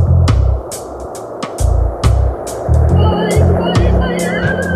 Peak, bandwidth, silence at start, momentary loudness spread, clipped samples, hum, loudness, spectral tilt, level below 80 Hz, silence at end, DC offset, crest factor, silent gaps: 0 dBFS; 14 kHz; 0 s; 13 LU; under 0.1%; none; -14 LUFS; -6.5 dB/octave; -18 dBFS; 0 s; under 0.1%; 12 dB; none